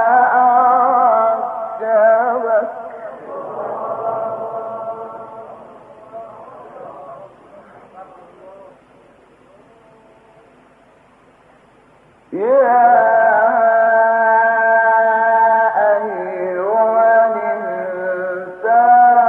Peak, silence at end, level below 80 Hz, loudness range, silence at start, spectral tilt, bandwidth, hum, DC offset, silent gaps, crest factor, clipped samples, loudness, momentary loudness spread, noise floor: -2 dBFS; 0 s; -68 dBFS; 20 LU; 0 s; -7.5 dB/octave; 3.5 kHz; none; under 0.1%; none; 14 dB; under 0.1%; -14 LUFS; 23 LU; -49 dBFS